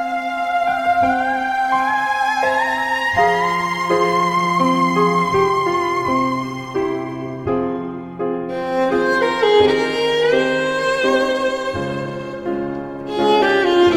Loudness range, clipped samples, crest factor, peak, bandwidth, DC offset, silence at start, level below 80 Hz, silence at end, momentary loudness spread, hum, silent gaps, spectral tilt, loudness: 4 LU; under 0.1%; 16 dB; -2 dBFS; 15.5 kHz; under 0.1%; 0 s; -50 dBFS; 0 s; 9 LU; none; none; -5 dB/octave; -18 LUFS